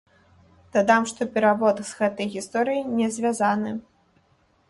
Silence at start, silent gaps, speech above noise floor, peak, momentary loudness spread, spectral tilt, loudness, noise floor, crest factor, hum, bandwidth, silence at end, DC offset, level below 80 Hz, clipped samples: 0.75 s; none; 40 dB; -6 dBFS; 8 LU; -4.5 dB/octave; -23 LUFS; -63 dBFS; 20 dB; none; 11.5 kHz; 0.9 s; under 0.1%; -64 dBFS; under 0.1%